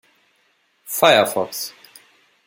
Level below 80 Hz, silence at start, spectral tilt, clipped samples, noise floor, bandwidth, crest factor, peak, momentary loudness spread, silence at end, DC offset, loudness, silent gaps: -68 dBFS; 0.85 s; -2.5 dB/octave; under 0.1%; -63 dBFS; 17 kHz; 20 dB; -2 dBFS; 15 LU; 0.75 s; under 0.1%; -18 LUFS; none